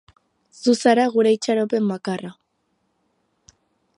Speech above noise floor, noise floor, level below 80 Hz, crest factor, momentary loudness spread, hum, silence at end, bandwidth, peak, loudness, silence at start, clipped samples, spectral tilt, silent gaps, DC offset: 51 dB; -70 dBFS; -70 dBFS; 18 dB; 12 LU; none; 1.65 s; 11 kHz; -4 dBFS; -20 LUFS; 0.6 s; under 0.1%; -5 dB/octave; none; under 0.1%